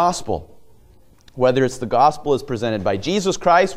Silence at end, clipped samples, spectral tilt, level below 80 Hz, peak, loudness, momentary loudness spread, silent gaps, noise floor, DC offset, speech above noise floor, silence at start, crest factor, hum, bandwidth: 0 s; under 0.1%; -5 dB/octave; -46 dBFS; -2 dBFS; -19 LUFS; 8 LU; none; -49 dBFS; under 0.1%; 31 dB; 0 s; 18 dB; none; 15 kHz